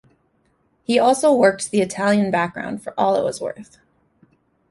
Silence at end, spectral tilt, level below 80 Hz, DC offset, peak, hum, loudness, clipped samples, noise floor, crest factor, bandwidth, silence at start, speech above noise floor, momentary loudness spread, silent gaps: 1.1 s; -4.5 dB/octave; -62 dBFS; under 0.1%; -2 dBFS; none; -19 LUFS; under 0.1%; -64 dBFS; 18 dB; 11.5 kHz; 0.9 s; 45 dB; 14 LU; none